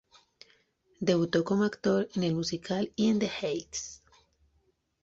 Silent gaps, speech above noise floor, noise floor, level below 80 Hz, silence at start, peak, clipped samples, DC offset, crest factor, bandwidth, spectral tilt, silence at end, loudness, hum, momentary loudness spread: none; 44 dB; -72 dBFS; -64 dBFS; 1 s; -14 dBFS; under 0.1%; under 0.1%; 18 dB; 7.8 kHz; -5.5 dB/octave; 1.05 s; -30 LUFS; none; 8 LU